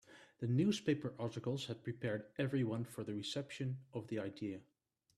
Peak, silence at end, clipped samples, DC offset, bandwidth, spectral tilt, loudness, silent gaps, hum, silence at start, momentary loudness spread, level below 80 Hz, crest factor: -24 dBFS; 0.55 s; under 0.1%; under 0.1%; 13 kHz; -6.5 dB/octave; -41 LUFS; none; none; 0.1 s; 10 LU; -76 dBFS; 18 dB